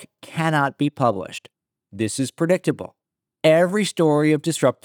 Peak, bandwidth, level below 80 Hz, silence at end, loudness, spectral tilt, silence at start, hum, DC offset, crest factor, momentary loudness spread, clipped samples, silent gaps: -2 dBFS; 18.5 kHz; -74 dBFS; 0.1 s; -20 LUFS; -5.5 dB/octave; 0 s; none; under 0.1%; 18 dB; 15 LU; under 0.1%; none